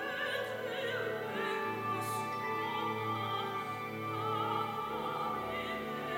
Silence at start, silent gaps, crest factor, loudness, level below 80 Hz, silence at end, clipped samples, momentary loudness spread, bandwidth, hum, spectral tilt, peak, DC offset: 0 s; none; 16 dB; -36 LUFS; -70 dBFS; 0 s; under 0.1%; 3 LU; 16 kHz; none; -4.5 dB/octave; -22 dBFS; under 0.1%